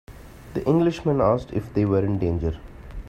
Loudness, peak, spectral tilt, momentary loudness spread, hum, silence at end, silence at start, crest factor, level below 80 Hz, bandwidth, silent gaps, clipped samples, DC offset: -23 LUFS; -6 dBFS; -9 dB/octave; 11 LU; none; 0 s; 0.1 s; 18 dB; -40 dBFS; 14 kHz; none; under 0.1%; under 0.1%